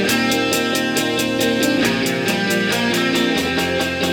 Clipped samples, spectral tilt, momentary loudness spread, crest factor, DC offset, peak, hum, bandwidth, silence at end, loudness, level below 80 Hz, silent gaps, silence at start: under 0.1%; -3.5 dB/octave; 2 LU; 14 dB; under 0.1%; -4 dBFS; none; 18.5 kHz; 0 s; -17 LUFS; -48 dBFS; none; 0 s